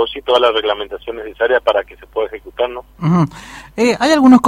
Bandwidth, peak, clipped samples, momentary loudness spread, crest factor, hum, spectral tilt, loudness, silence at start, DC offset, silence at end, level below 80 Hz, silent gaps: 12.5 kHz; 0 dBFS; under 0.1%; 13 LU; 14 dB; none; -6 dB/octave; -16 LUFS; 0 s; under 0.1%; 0 s; -46 dBFS; none